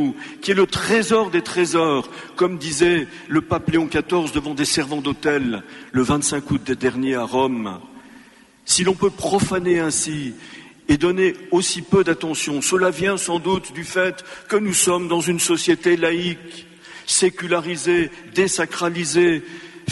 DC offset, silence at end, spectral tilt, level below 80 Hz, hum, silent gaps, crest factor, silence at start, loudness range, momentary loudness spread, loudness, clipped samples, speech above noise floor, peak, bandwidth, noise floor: under 0.1%; 0 s; -3.5 dB/octave; -48 dBFS; none; none; 18 dB; 0 s; 2 LU; 10 LU; -20 LUFS; under 0.1%; 28 dB; -2 dBFS; 11.5 kHz; -48 dBFS